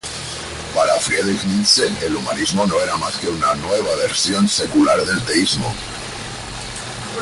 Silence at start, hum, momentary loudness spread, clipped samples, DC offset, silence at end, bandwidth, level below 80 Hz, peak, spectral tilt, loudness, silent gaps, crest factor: 0.05 s; none; 13 LU; under 0.1%; under 0.1%; 0 s; 11.5 kHz; -42 dBFS; -2 dBFS; -3 dB/octave; -18 LUFS; none; 16 dB